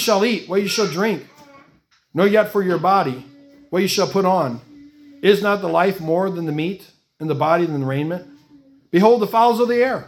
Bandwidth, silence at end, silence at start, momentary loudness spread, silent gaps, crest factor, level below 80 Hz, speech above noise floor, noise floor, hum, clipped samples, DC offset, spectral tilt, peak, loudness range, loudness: 18 kHz; 0.05 s; 0 s; 11 LU; none; 18 dB; -64 dBFS; 40 dB; -57 dBFS; none; under 0.1%; under 0.1%; -5.5 dB/octave; 0 dBFS; 2 LU; -18 LUFS